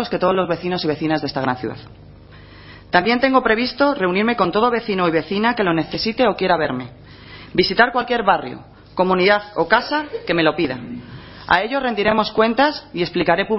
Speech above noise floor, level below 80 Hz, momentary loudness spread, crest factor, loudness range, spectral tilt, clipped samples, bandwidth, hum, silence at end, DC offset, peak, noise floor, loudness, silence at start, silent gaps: 23 dB; -48 dBFS; 13 LU; 18 dB; 2 LU; -8 dB/octave; under 0.1%; 6 kHz; none; 0 s; under 0.1%; 0 dBFS; -42 dBFS; -18 LUFS; 0 s; none